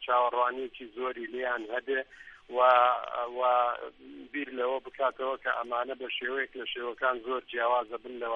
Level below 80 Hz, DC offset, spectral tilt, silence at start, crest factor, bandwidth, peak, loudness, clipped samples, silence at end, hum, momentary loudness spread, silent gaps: -68 dBFS; under 0.1%; -4.5 dB/octave; 0 s; 22 dB; 5.8 kHz; -8 dBFS; -30 LUFS; under 0.1%; 0 s; none; 13 LU; none